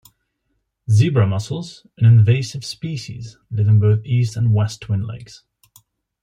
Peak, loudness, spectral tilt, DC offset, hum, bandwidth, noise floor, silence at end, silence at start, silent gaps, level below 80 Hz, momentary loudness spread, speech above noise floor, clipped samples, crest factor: -4 dBFS; -18 LUFS; -7 dB/octave; under 0.1%; none; 10.5 kHz; -71 dBFS; 0.85 s; 0.9 s; none; -54 dBFS; 18 LU; 54 dB; under 0.1%; 14 dB